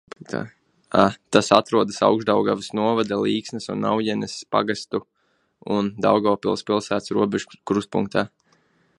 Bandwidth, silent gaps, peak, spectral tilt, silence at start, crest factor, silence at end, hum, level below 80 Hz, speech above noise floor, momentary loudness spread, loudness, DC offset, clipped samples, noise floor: 11.5 kHz; none; 0 dBFS; -5 dB/octave; 0.2 s; 22 dB; 0.7 s; none; -60 dBFS; 46 dB; 12 LU; -22 LUFS; under 0.1%; under 0.1%; -67 dBFS